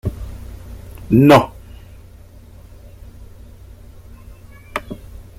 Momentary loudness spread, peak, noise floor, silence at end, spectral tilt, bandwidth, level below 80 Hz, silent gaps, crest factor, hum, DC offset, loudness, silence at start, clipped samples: 27 LU; 0 dBFS; -41 dBFS; 0.2 s; -7 dB/octave; 16 kHz; -38 dBFS; none; 20 dB; none; under 0.1%; -15 LUFS; 0.05 s; under 0.1%